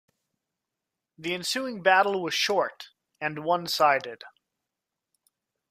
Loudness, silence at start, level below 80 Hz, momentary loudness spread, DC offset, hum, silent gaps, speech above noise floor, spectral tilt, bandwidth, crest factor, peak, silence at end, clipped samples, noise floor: -25 LUFS; 1.2 s; -76 dBFS; 18 LU; under 0.1%; none; none; 61 dB; -2.5 dB/octave; 15.5 kHz; 22 dB; -6 dBFS; 1.4 s; under 0.1%; -87 dBFS